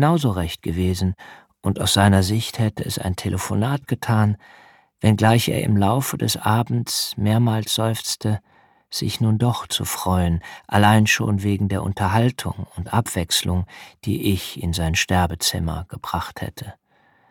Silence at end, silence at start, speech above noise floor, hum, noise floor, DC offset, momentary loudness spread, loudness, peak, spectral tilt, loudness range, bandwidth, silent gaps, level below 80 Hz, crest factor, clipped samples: 0.6 s; 0 s; 38 dB; none; -59 dBFS; under 0.1%; 11 LU; -21 LUFS; -2 dBFS; -5 dB/octave; 3 LU; 18 kHz; none; -42 dBFS; 20 dB; under 0.1%